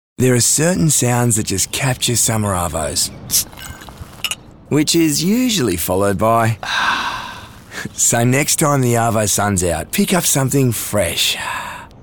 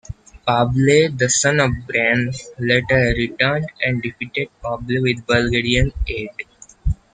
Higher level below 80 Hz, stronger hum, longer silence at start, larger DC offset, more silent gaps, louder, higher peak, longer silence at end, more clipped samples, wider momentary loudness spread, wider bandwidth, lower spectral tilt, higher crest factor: second, -42 dBFS vs -32 dBFS; neither; about the same, 0.2 s vs 0.1 s; neither; neither; first, -15 LUFS vs -18 LUFS; about the same, -2 dBFS vs 0 dBFS; about the same, 0.1 s vs 0.2 s; neither; about the same, 14 LU vs 12 LU; first, 19 kHz vs 9.6 kHz; about the same, -3.5 dB/octave vs -4.5 dB/octave; about the same, 16 dB vs 18 dB